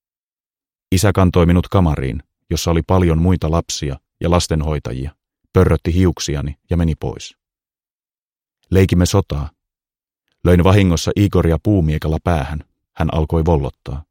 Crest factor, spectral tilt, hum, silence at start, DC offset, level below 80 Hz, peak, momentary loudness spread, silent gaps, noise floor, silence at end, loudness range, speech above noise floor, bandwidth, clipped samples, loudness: 16 dB; -6.5 dB/octave; none; 0.9 s; under 0.1%; -28 dBFS; 0 dBFS; 13 LU; 7.90-7.99 s, 8.20-8.28 s; under -90 dBFS; 0.1 s; 4 LU; over 75 dB; 16.5 kHz; under 0.1%; -17 LUFS